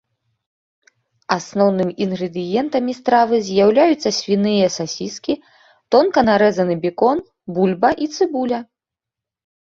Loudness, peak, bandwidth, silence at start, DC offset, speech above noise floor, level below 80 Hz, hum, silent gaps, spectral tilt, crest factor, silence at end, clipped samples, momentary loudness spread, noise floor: -18 LUFS; -2 dBFS; 7.8 kHz; 1.3 s; under 0.1%; 69 dB; -56 dBFS; none; none; -5.5 dB/octave; 18 dB; 1.05 s; under 0.1%; 10 LU; -86 dBFS